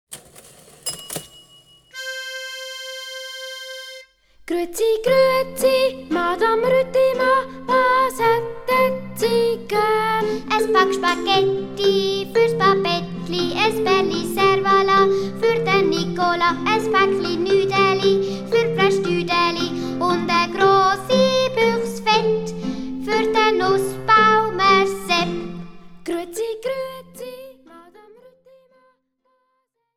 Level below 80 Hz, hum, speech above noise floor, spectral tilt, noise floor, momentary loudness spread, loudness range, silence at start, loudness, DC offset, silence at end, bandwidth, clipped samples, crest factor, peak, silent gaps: -50 dBFS; none; 53 dB; -4.5 dB/octave; -71 dBFS; 14 LU; 13 LU; 0.1 s; -19 LUFS; under 0.1%; 2.15 s; over 20 kHz; under 0.1%; 18 dB; -2 dBFS; none